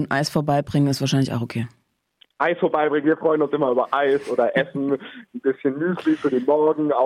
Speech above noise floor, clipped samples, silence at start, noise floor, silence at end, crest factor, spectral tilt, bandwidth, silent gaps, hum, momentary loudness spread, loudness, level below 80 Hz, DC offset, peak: 39 dB; under 0.1%; 0 s; -60 dBFS; 0 s; 14 dB; -6.5 dB/octave; 15.5 kHz; none; none; 7 LU; -21 LUFS; -62 dBFS; under 0.1%; -6 dBFS